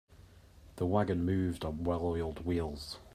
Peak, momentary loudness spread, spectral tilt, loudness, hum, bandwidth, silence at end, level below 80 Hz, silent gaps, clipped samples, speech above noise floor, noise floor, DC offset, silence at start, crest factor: -16 dBFS; 7 LU; -7.5 dB/octave; -34 LUFS; none; 14.5 kHz; 0.05 s; -52 dBFS; none; under 0.1%; 24 dB; -57 dBFS; under 0.1%; 0.1 s; 18 dB